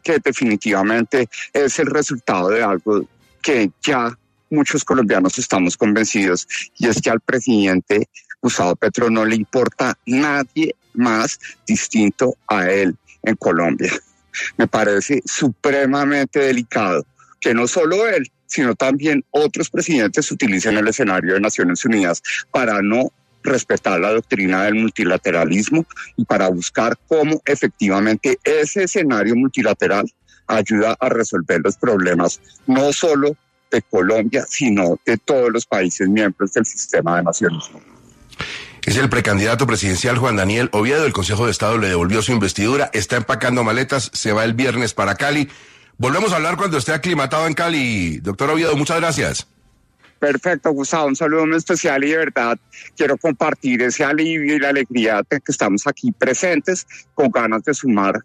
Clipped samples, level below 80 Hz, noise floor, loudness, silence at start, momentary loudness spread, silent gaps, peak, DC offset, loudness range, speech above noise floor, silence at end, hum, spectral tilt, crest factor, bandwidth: under 0.1%; -50 dBFS; -56 dBFS; -17 LUFS; 0.05 s; 5 LU; none; -2 dBFS; under 0.1%; 2 LU; 39 dB; 0.05 s; none; -4.5 dB/octave; 16 dB; 13.5 kHz